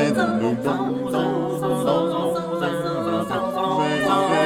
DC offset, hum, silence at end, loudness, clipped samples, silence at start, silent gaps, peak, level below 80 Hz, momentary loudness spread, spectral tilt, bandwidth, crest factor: under 0.1%; none; 0 s; -22 LUFS; under 0.1%; 0 s; none; -6 dBFS; -56 dBFS; 4 LU; -6 dB/octave; 17 kHz; 14 dB